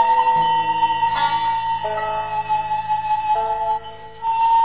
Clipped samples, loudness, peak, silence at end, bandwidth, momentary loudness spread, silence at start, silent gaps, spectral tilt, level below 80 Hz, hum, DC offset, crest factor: under 0.1%; -20 LUFS; -8 dBFS; 0 s; 4 kHz; 7 LU; 0 s; none; -1 dB/octave; -52 dBFS; none; 0.8%; 12 dB